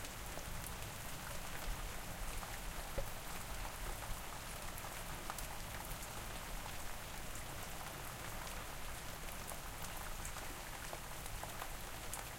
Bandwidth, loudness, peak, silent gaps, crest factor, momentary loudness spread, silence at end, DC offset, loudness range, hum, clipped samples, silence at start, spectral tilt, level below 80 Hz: 17 kHz; -46 LUFS; -26 dBFS; none; 20 dB; 2 LU; 0 s; under 0.1%; 1 LU; none; under 0.1%; 0 s; -3 dB/octave; -50 dBFS